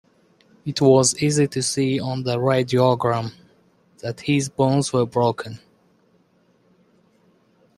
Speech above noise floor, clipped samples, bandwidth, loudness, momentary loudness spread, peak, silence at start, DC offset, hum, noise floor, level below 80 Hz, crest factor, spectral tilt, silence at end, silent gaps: 41 dB; under 0.1%; 13 kHz; -20 LUFS; 16 LU; -2 dBFS; 0.65 s; under 0.1%; none; -61 dBFS; -60 dBFS; 20 dB; -5 dB/octave; 2.2 s; none